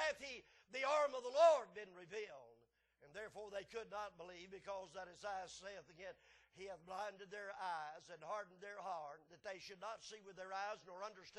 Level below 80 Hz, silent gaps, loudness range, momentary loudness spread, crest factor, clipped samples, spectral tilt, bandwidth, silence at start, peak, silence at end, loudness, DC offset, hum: -82 dBFS; none; 11 LU; 17 LU; 24 dB; under 0.1%; -2.5 dB/octave; 11.5 kHz; 0 s; -22 dBFS; 0 s; -45 LUFS; under 0.1%; none